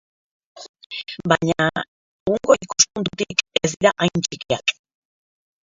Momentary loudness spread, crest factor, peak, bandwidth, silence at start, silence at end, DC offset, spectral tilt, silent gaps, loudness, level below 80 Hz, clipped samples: 13 LU; 22 dB; 0 dBFS; 7.8 kHz; 0.55 s; 0.95 s; under 0.1%; -3 dB/octave; 0.69-0.74 s, 0.86-0.90 s, 1.88-2.26 s; -20 LUFS; -54 dBFS; under 0.1%